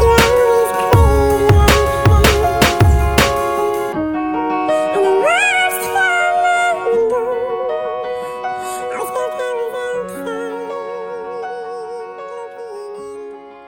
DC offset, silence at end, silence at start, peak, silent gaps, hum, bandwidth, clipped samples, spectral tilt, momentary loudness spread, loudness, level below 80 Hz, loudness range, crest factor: under 0.1%; 0 s; 0 s; 0 dBFS; none; none; over 20 kHz; under 0.1%; -5 dB/octave; 17 LU; -15 LUFS; -24 dBFS; 12 LU; 16 dB